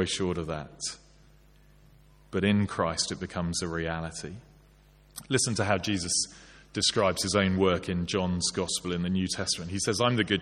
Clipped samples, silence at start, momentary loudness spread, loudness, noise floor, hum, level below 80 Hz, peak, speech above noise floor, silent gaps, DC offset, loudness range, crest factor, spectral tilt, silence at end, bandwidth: under 0.1%; 0 s; 11 LU; -28 LUFS; -58 dBFS; none; -54 dBFS; -8 dBFS; 29 dB; none; under 0.1%; 4 LU; 22 dB; -4 dB/octave; 0 s; 14 kHz